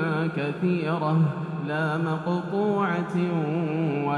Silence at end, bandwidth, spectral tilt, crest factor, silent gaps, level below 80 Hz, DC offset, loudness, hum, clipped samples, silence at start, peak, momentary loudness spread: 0 s; 10 kHz; -8.5 dB/octave; 12 dB; none; -66 dBFS; under 0.1%; -26 LUFS; none; under 0.1%; 0 s; -12 dBFS; 3 LU